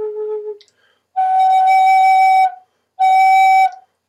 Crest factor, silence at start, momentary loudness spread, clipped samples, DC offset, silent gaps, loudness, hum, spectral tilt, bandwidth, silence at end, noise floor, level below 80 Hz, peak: 10 dB; 0 s; 14 LU; under 0.1%; under 0.1%; none; -12 LUFS; none; 1.5 dB/octave; 13.5 kHz; 0.35 s; -59 dBFS; -88 dBFS; -4 dBFS